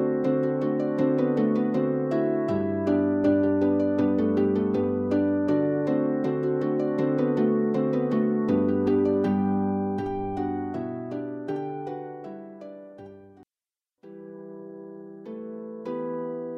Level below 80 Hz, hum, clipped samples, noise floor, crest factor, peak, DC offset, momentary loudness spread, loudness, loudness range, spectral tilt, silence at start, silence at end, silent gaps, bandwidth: -62 dBFS; none; under 0.1%; under -90 dBFS; 16 dB; -10 dBFS; under 0.1%; 18 LU; -25 LUFS; 16 LU; -10 dB/octave; 0 s; 0 s; none; 6 kHz